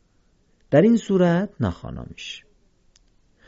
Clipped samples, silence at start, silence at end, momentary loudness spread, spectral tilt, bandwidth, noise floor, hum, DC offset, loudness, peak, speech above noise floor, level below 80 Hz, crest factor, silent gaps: under 0.1%; 0.7 s; 1.1 s; 19 LU; -7.5 dB/octave; 7.8 kHz; -62 dBFS; none; under 0.1%; -20 LUFS; -4 dBFS; 41 dB; -46 dBFS; 20 dB; none